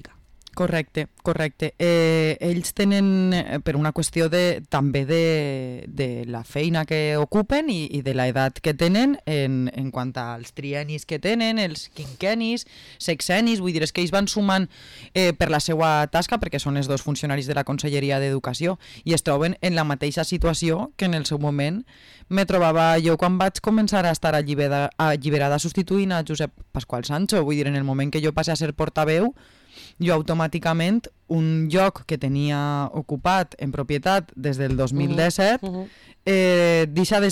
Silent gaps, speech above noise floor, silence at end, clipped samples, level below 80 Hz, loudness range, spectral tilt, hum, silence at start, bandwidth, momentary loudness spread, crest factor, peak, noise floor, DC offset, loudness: none; 27 dB; 0 s; under 0.1%; -44 dBFS; 3 LU; -5.5 dB/octave; none; 0 s; 16 kHz; 9 LU; 10 dB; -12 dBFS; -49 dBFS; under 0.1%; -22 LUFS